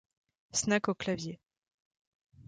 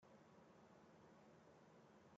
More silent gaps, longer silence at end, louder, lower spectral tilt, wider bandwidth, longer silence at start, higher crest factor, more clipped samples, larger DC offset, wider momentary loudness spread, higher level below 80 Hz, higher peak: first, 1.57-1.62 s, 1.74-1.91 s, 1.97-2.25 s vs none; about the same, 0.05 s vs 0 s; first, -32 LUFS vs -69 LUFS; second, -3.5 dB/octave vs -5.5 dB/octave; first, 9.6 kHz vs 7.4 kHz; first, 0.55 s vs 0 s; first, 22 dB vs 12 dB; neither; neither; first, 13 LU vs 1 LU; first, -66 dBFS vs under -90 dBFS; first, -16 dBFS vs -56 dBFS